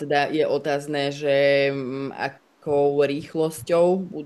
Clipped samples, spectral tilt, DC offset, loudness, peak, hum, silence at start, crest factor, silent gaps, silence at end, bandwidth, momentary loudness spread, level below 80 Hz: under 0.1%; -5.5 dB/octave; under 0.1%; -23 LUFS; -6 dBFS; none; 0 s; 16 dB; none; 0 s; 12.5 kHz; 10 LU; -68 dBFS